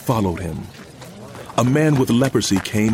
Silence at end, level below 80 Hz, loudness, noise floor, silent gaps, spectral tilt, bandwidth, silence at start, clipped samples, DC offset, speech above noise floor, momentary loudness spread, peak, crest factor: 0 s; -44 dBFS; -19 LUFS; -38 dBFS; none; -5.5 dB/octave; 16.5 kHz; 0 s; under 0.1%; under 0.1%; 20 dB; 21 LU; -2 dBFS; 16 dB